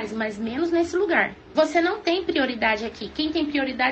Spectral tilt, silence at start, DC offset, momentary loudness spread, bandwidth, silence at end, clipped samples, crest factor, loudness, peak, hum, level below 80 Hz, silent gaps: -4.5 dB/octave; 0 s; under 0.1%; 7 LU; 8.4 kHz; 0 s; under 0.1%; 16 dB; -23 LUFS; -8 dBFS; none; -54 dBFS; none